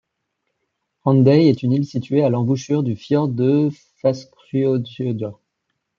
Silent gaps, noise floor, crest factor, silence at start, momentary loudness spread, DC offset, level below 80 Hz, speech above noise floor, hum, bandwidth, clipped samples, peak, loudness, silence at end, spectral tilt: none; -75 dBFS; 16 dB; 1.05 s; 11 LU; under 0.1%; -64 dBFS; 58 dB; none; 7.2 kHz; under 0.1%; -4 dBFS; -19 LUFS; 0.65 s; -8.5 dB/octave